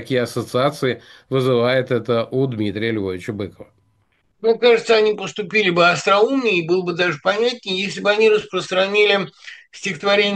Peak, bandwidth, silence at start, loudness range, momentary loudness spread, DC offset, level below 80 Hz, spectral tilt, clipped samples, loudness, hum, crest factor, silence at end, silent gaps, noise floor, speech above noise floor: -2 dBFS; 12.5 kHz; 0 s; 5 LU; 12 LU; under 0.1%; -62 dBFS; -5 dB/octave; under 0.1%; -18 LUFS; none; 18 dB; 0 s; none; -64 dBFS; 45 dB